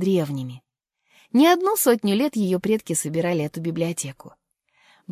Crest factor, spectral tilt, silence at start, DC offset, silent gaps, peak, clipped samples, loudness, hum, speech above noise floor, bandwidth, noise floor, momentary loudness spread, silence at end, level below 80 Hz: 18 dB; -5 dB/octave; 0 s; under 0.1%; none; -4 dBFS; under 0.1%; -22 LUFS; none; 47 dB; 16 kHz; -69 dBFS; 12 LU; 0 s; -66 dBFS